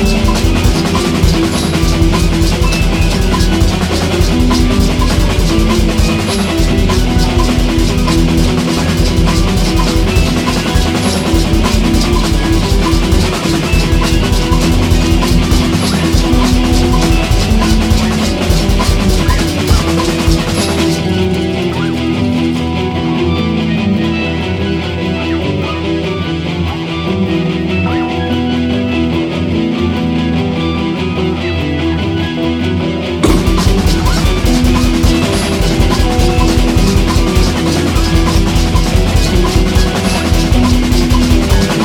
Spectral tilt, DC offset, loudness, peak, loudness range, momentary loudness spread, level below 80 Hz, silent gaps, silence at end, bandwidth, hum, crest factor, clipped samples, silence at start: -5.5 dB/octave; under 0.1%; -12 LUFS; 0 dBFS; 3 LU; 4 LU; -16 dBFS; none; 0 s; 17.5 kHz; none; 10 dB; under 0.1%; 0 s